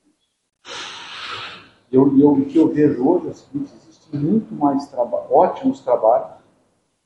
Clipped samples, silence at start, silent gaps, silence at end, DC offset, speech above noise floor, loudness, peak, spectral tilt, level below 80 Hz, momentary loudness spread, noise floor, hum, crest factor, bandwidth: under 0.1%; 0.65 s; none; 0.75 s; under 0.1%; 48 dB; -18 LUFS; 0 dBFS; -7.5 dB/octave; -62 dBFS; 16 LU; -65 dBFS; none; 18 dB; 8.6 kHz